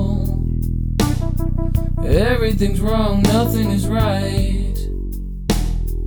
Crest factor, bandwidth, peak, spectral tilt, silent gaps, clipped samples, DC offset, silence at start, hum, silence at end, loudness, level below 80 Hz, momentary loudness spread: 14 dB; 19.5 kHz; -2 dBFS; -6.5 dB/octave; none; under 0.1%; under 0.1%; 0 s; none; 0 s; -19 LUFS; -22 dBFS; 8 LU